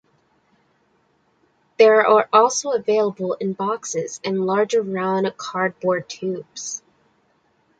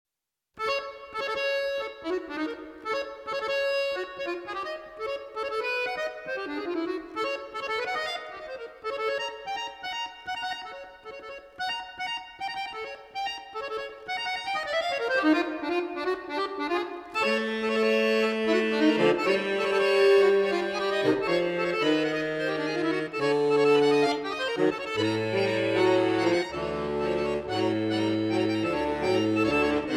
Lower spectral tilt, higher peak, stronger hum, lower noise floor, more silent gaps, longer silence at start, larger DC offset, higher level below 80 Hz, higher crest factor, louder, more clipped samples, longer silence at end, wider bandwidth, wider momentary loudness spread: about the same, -4 dB/octave vs -5 dB/octave; first, -2 dBFS vs -10 dBFS; neither; second, -63 dBFS vs -84 dBFS; neither; first, 1.8 s vs 0.55 s; neither; second, -70 dBFS vs -60 dBFS; about the same, 20 dB vs 16 dB; first, -20 LUFS vs -27 LUFS; neither; first, 1 s vs 0 s; second, 9.2 kHz vs 13.5 kHz; about the same, 14 LU vs 12 LU